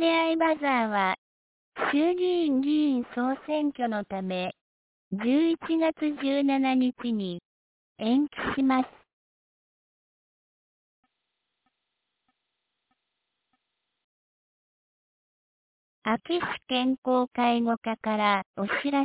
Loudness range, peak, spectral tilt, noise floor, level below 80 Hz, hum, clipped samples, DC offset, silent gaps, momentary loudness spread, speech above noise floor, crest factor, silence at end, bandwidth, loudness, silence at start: 7 LU; -10 dBFS; -3 dB/octave; -82 dBFS; -66 dBFS; none; under 0.1%; under 0.1%; 1.18-1.72 s, 4.61-5.11 s, 7.45-7.96 s, 9.13-11.03 s, 14.04-16.02 s, 16.98-17.02 s, 17.77-17.81 s, 18.46-18.54 s; 8 LU; 56 dB; 18 dB; 0 s; 4 kHz; -27 LUFS; 0 s